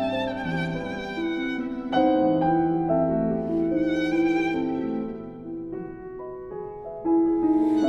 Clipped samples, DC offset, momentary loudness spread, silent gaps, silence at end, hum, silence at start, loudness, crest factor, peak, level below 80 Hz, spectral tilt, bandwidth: under 0.1%; under 0.1%; 15 LU; none; 0 s; none; 0 s; -25 LUFS; 14 dB; -10 dBFS; -52 dBFS; -7.5 dB/octave; 6.6 kHz